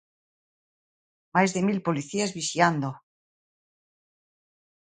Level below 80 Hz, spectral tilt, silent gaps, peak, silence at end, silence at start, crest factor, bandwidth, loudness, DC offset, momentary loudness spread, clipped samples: -70 dBFS; -4.5 dB/octave; none; -4 dBFS; 2 s; 1.35 s; 26 dB; 9.4 kHz; -26 LUFS; under 0.1%; 7 LU; under 0.1%